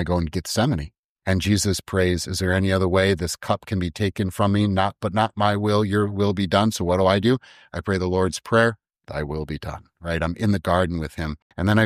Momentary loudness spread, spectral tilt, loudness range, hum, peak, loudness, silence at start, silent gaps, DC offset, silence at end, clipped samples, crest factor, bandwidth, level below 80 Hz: 11 LU; -5.5 dB/octave; 3 LU; none; -4 dBFS; -22 LUFS; 0 s; 0.98-1.16 s, 11.42-11.50 s; under 0.1%; 0 s; under 0.1%; 18 dB; 15.5 kHz; -44 dBFS